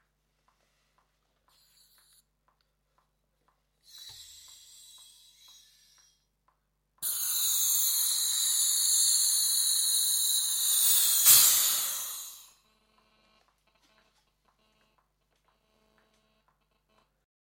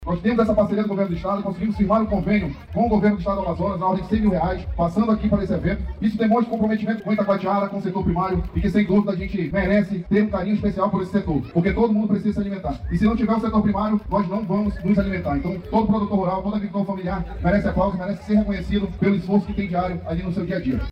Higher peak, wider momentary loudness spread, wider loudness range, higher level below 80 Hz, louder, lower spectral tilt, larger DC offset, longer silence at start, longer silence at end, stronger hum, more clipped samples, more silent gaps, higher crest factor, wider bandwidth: first, -4 dBFS vs -8 dBFS; first, 17 LU vs 6 LU; first, 14 LU vs 1 LU; second, -78 dBFS vs -34 dBFS; about the same, -23 LUFS vs -22 LUFS; second, 4 dB/octave vs -9 dB/octave; neither; first, 3.95 s vs 0 s; first, 5.1 s vs 0 s; first, 50 Hz at -80 dBFS vs none; neither; neither; first, 26 dB vs 12 dB; first, 17 kHz vs 6 kHz